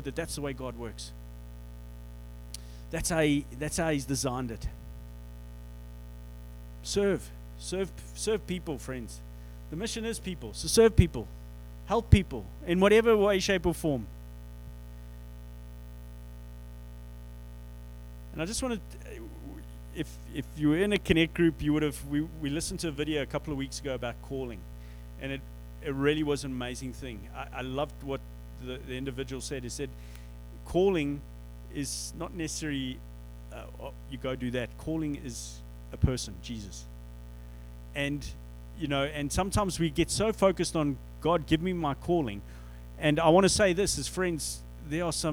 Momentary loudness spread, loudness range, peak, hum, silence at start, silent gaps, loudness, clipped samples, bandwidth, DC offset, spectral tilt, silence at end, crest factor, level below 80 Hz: 21 LU; 11 LU; -4 dBFS; 60 Hz at -45 dBFS; 0 s; none; -30 LUFS; under 0.1%; over 20 kHz; under 0.1%; -5 dB/octave; 0 s; 28 dB; -42 dBFS